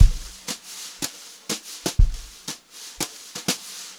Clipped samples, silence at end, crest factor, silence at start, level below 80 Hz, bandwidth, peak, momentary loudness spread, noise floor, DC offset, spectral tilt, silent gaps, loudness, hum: under 0.1%; 0.05 s; 24 dB; 0 s; -26 dBFS; 17 kHz; 0 dBFS; 12 LU; -40 dBFS; under 0.1%; -3.5 dB/octave; none; -29 LUFS; none